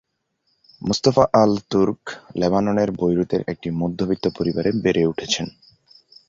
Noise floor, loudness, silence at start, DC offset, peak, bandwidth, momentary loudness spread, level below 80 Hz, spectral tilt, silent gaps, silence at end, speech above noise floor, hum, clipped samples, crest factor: -71 dBFS; -20 LUFS; 0.8 s; under 0.1%; -2 dBFS; 7.6 kHz; 9 LU; -50 dBFS; -5.5 dB/octave; none; 0.8 s; 51 dB; none; under 0.1%; 20 dB